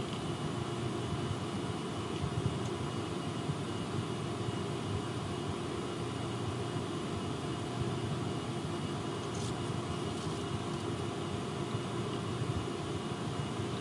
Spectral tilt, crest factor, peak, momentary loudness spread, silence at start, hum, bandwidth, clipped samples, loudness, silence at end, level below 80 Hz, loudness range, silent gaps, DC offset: -5.5 dB/octave; 16 dB; -20 dBFS; 2 LU; 0 s; none; 11.5 kHz; under 0.1%; -37 LUFS; 0 s; -58 dBFS; 0 LU; none; under 0.1%